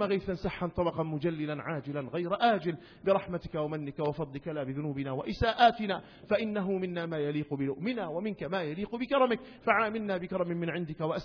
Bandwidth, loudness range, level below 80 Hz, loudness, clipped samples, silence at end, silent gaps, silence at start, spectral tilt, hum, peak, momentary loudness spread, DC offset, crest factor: 5.4 kHz; 2 LU; -56 dBFS; -32 LUFS; under 0.1%; 0 s; none; 0 s; -4.5 dB/octave; none; -10 dBFS; 8 LU; under 0.1%; 22 dB